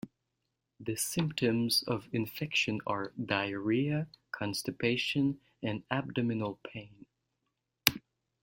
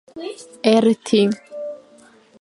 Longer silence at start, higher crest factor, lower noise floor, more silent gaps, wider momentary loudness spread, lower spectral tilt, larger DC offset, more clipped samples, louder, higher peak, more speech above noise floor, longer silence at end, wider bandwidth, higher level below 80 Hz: about the same, 0.05 s vs 0.15 s; first, 32 dB vs 20 dB; first, -84 dBFS vs -50 dBFS; neither; second, 10 LU vs 18 LU; about the same, -4.5 dB/octave vs -5.5 dB/octave; neither; neither; second, -32 LUFS vs -18 LUFS; about the same, -2 dBFS vs 0 dBFS; first, 51 dB vs 32 dB; second, 0.45 s vs 0.65 s; first, 16.5 kHz vs 11.5 kHz; about the same, -66 dBFS vs -70 dBFS